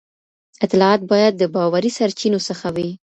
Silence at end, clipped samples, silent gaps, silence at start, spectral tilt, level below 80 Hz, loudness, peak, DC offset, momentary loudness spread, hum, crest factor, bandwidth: 0.1 s; under 0.1%; none; 0.6 s; -5.5 dB/octave; -60 dBFS; -18 LUFS; 0 dBFS; under 0.1%; 9 LU; none; 18 dB; 8.4 kHz